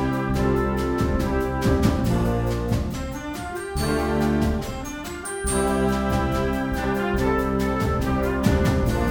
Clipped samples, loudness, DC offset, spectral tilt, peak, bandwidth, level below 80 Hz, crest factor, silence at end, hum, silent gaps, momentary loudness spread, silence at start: under 0.1%; -23 LUFS; under 0.1%; -6 dB/octave; -6 dBFS; over 20 kHz; -30 dBFS; 16 dB; 0 s; none; none; 9 LU; 0 s